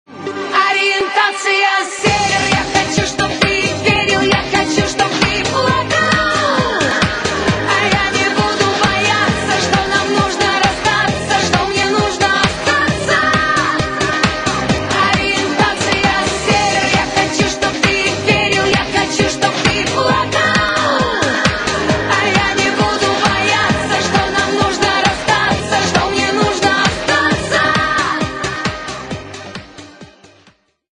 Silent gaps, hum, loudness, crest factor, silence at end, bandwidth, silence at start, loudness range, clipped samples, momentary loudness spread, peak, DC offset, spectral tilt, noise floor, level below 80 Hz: none; none; -14 LUFS; 14 dB; 0.9 s; 11.5 kHz; 0.1 s; 1 LU; under 0.1%; 3 LU; 0 dBFS; under 0.1%; -3.5 dB/octave; -52 dBFS; -36 dBFS